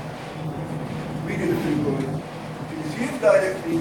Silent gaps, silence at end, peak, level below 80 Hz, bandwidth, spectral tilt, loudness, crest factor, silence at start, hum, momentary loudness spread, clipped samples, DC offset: none; 0 s; -6 dBFS; -52 dBFS; 17 kHz; -6.5 dB/octave; -25 LUFS; 18 dB; 0 s; none; 14 LU; under 0.1%; under 0.1%